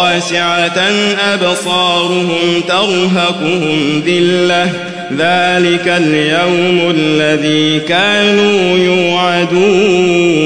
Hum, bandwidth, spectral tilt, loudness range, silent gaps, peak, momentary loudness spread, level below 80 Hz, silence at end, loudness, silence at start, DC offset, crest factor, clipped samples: none; 11 kHz; -4.5 dB/octave; 2 LU; none; 0 dBFS; 3 LU; -52 dBFS; 0 s; -11 LUFS; 0 s; 0.6%; 10 dB; under 0.1%